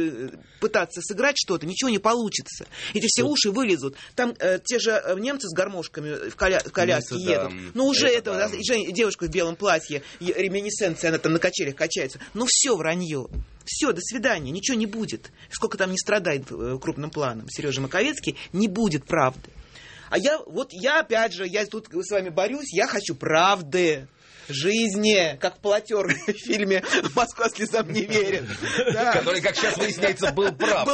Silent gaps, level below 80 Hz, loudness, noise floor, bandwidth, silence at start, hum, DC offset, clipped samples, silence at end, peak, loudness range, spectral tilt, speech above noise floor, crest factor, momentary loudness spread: none; -50 dBFS; -24 LUFS; -45 dBFS; 8.8 kHz; 0 s; none; under 0.1%; under 0.1%; 0 s; -6 dBFS; 3 LU; -3 dB/octave; 21 dB; 20 dB; 10 LU